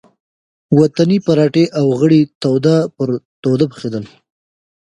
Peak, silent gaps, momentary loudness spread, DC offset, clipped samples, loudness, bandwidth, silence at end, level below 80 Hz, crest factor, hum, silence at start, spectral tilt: 0 dBFS; 2.35-2.41 s, 3.25-3.43 s; 9 LU; under 0.1%; under 0.1%; -14 LUFS; 11 kHz; 0.9 s; -56 dBFS; 14 dB; none; 0.7 s; -8 dB/octave